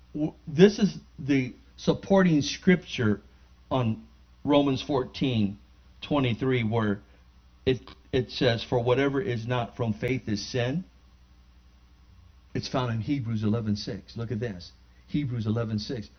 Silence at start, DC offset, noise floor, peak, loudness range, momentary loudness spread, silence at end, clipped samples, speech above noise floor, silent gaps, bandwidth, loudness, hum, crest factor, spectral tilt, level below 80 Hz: 0.15 s; under 0.1%; -56 dBFS; -4 dBFS; 7 LU; 12 LU; 0.1 s; under 0.1%; 29 dB; none; 6.6 kHz; -27 LUFS; 60 Hz at -50 dBFS; 24 dB; -6.5 dB/octave; -52 dBFS